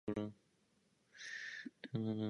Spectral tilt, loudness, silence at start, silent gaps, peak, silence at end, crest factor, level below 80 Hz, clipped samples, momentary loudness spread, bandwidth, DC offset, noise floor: -6 dB/octave; -46 LUFS; 0.05 s; none; -28 dBFS; 0 s; 18 dB; -74 dBFS; under 0.1%; 10 LU; 10.5 kHz; under 0.1%; -77 dBFS